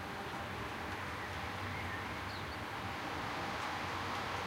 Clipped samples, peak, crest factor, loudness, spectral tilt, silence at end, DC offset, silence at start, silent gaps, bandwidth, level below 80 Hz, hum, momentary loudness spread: under 0.1%; -28 dBFS; 14 dB; -41 LUFS; -4.5 dB/octave; 0 s; under 0.1%; 0 s; none; 16 kHz; -58 dBFS; none; 3 LU